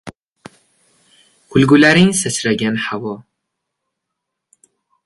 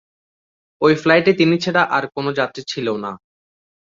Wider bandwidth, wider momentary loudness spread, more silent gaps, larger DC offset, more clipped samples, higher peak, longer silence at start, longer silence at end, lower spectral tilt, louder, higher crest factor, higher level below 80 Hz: first, 11.5 kHz vs 7.6 kHz; first, 16 LU vs 10 LU; first, 0.18-0.36 s vs none; neither; neither; about the same, 0 dBFS vs -2 dBFS; second, 0.05 s vs 0.8 s; first, 1.85 s vs 0.8 s; second, -4.5 dB/octave vs -6 dB/octave; first, -14 LUFS vs -17 LUFS; about the same, 18 dB vs 18 dB; first, -52 dBFS vs -60 dBFS